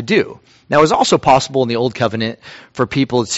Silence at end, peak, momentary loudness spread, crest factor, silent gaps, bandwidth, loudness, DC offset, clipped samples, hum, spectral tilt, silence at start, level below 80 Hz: 0 s; 0 dBFS; 12 LU; 16 dB; none; 8.2 kHz; -15 LUFS; under 0.1%; under 0.1%; none; -4.5 dB/octave; 0 s; -48 dBFS